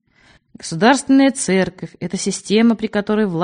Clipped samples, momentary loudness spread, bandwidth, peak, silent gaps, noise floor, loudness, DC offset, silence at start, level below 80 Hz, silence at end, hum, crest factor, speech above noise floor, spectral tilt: under 0.1%; 14 LU; 10 kHz; 0 dBFS; none; -53 dBFS; -16 LUFS; under 0.1%; 0.65 s; -54 dBFS; 0 s; none; 18 dB; 37 dB; -4.5 dB/octave